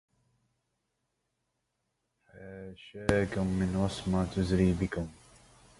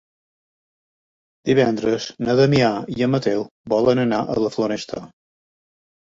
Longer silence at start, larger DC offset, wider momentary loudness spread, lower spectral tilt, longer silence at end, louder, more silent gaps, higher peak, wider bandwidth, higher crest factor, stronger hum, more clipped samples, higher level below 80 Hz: first, 2.35 s vs 1.45 s; neither; first, 19 LU vs 10 LU; about the same, -7 dB/octave vs -6.5 dB/octave; second, 0.65 s vs 0.95 s; second, -30 LUFS vs -20 LUFS; second, none vs 3.51-3.64 s; second, -8 dBFS vs -4 dBFS; first, 11.5 kHz vs 7.8 kHz; first, 26 dB vs 18 dB; neither; neither; first, -48 dBFS vs -54 dBFS